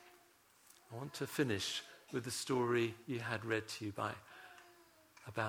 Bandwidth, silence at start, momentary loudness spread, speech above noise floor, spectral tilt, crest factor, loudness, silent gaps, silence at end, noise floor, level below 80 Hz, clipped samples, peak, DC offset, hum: over 20 kHz; 0 s; 20 LU; 29 dB; -4.5 dB/octave; 20 dB; -40 LUFS; none; 0 s; -68 dBFS; -78 dBFS; under 0.1%; -20 dBFS; under 0.1%; none